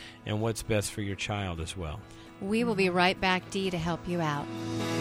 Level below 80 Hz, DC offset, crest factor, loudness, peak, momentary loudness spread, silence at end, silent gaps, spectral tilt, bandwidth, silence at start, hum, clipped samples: -50 dBFS; under 0.1%; 20 dB; -30 LUFS; -10 dBFS; 12 LU; 0 s; none; -5 dB/octave; 16 kHz; 0 s; none; under 0.1%